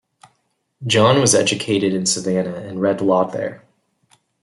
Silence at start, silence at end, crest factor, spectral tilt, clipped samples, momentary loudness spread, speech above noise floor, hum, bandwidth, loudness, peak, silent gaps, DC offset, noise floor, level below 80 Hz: 0.8 s; 0.85 s; 18 dB; -4 dB/octave; under 0.1%; 13 LU; 50 dB; none; 12 kHz; -17 LUFS; -2 dBFS; none; under 0.1%; -68 dBFS; -60 dBFS